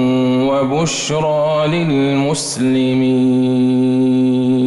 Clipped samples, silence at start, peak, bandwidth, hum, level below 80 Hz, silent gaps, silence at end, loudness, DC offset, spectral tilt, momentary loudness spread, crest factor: under 0.1%; 0 s; -6 dBFS; 12 kHz; none; -50 dBFS; none; 0 s; -15 LUFS; under 0.1%; -5.5 dB/octave; 3 LU; 8 dB